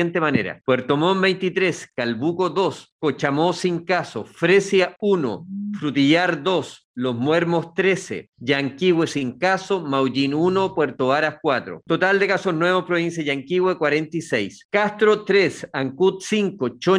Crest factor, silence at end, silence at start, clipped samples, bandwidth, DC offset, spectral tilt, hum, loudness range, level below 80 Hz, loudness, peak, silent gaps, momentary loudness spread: 16 dB; 0 s; 0 s; under 0.1%; 11 kHz; under 0.1%; -5.5 dB/octave; none; 1 LU; -64 dBFS; -21 LUFS; -4 dBFS; 2.92-2.99 s, 6.84-6.94 s, 14.65-14.69 s; 8 LU